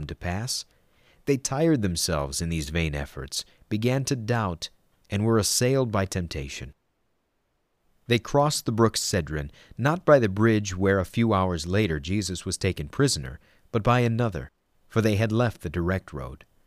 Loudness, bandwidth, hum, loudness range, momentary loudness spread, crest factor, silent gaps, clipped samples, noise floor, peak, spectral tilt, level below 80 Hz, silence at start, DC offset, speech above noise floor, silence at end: -25 LUFS; 15.5 kHz; none; 4 LU; 12 LU; 22 dB; none; under 0.1%; -73 dBFS; -4 dBFS; -5 dB/octave; -44 dBFS; 0 s; under 0.1%; 48 dB; 0.3 s